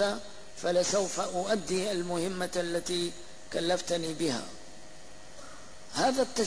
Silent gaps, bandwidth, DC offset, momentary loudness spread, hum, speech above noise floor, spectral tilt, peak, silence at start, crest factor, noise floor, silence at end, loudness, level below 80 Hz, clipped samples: none; 11 kHz; 0.7%; 21 LU; none; 21 dB; -3.5 dB/octave; -16 dBFS; 0 s; 16 dB; -51 dBFS; 0 s; -31 LUFS; -60 dBFS; under 0.1%